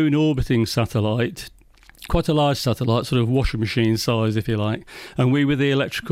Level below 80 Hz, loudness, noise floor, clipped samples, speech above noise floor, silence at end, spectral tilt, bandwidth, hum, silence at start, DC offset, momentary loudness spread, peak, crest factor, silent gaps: -36 dBFS; -21 LUFS; -48 dBFS; under 0.1%; 28 dB; 0 s; -6.5 dB/octave; 16 kHz; none; 0 s; under 0.1%; 7 LU; -8 dBFS; 14 dB; none